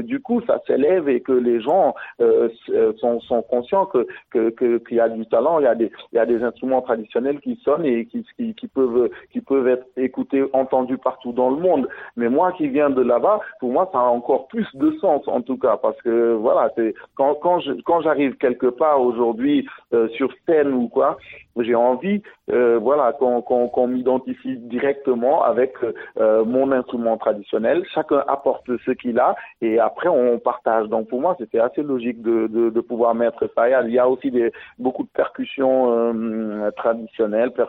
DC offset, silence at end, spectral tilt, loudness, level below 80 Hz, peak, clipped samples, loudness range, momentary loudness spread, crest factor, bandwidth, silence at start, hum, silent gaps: under 0.1%; 0 s; -9.5 dB/octave; -20 LUFS; -62 dBFS; -4 dBFS; under 0.1%; 2 LU; 7 LU; 14 dB; 4.1 kHz; 0 s; none; none